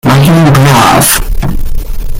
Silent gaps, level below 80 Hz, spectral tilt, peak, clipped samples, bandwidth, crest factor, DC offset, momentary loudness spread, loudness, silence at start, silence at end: none; -14 dBFS; -4.5 dB/octave; 0 dBFS; 0.7%; 17.5 kHz; 6 dB; under 0.1%; 15 LU; -6 LUFS; 0.05 s; 0 s